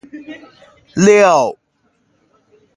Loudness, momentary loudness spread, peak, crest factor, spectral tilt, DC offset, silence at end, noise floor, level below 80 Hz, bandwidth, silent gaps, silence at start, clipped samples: -12 LUFS; 24 LU; 0 dBFS; 16 dB; -5 dB/octave; under 0.1%; 1.25 s; -62 dBFS; -56 dBFS; 10.5 kHz; none; 0.15 s; under 0.1%